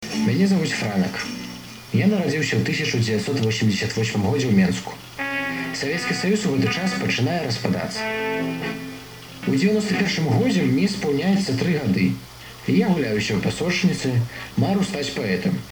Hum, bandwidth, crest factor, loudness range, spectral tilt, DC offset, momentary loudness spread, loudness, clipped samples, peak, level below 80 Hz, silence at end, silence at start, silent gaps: none; over 20 kHz; 16 dB; 2 LU; -5.5 dB/octave; under 0.1%; 9 LU; -22 LUFS; under 0.1%; -6 dBFS; -52 dBFS; 0 s; 0 s; none